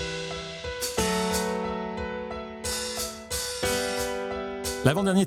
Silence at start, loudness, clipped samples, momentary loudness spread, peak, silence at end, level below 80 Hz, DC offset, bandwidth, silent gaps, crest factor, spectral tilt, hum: 0 s; -29 LUFS; under 0.1%; 9 LU; -6 dBFS; 0 s; -46 dBFS; under 0.1%; 17.5 kHz; none; 24 dB; -4 dB/octave; none